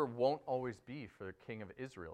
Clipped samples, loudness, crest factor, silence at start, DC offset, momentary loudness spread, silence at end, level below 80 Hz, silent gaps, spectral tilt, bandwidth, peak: under 0.1%; -42 LUFS; 20 dB; 0 s; under 0.1%; 15 LU; 0 s; -74 dBFS; none; -7 dB/octave; 9.6 kHz; -20 dBFS